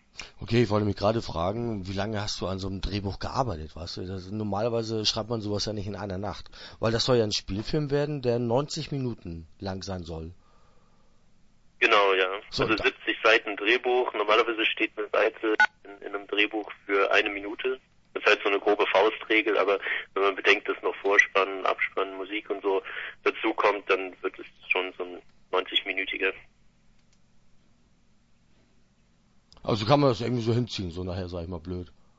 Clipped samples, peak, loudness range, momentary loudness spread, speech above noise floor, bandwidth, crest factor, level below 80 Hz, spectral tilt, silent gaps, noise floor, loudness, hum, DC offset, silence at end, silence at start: under 0.1%; -6 dBFS; 8 LU; 14 LU; 36 dB; 8 kHz; 22 dB; -50 dBFS; -5 dB/octave; none; -63 dBFS; -26 LUFS; none; under 0.1%; 0.3 s; 0.15 s